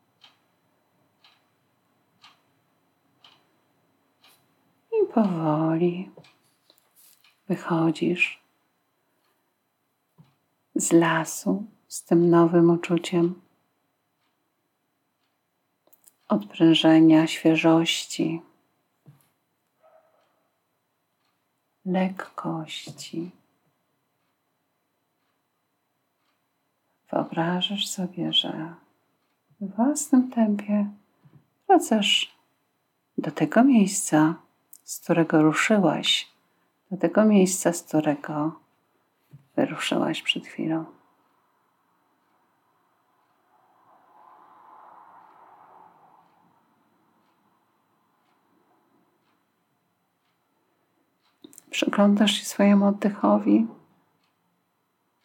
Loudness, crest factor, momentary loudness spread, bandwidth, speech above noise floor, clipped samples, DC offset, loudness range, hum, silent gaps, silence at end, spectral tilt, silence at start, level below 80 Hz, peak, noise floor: -23 LUFS; 20 dB; 17 LU; 17 kHz; 53 dB; under 0.1%; under 0.1%; 12 LU; none; none; 1.5 s; -5 dB/octave; 4.9 s; -86 dBFS; -6 dBFS; -75 dBFS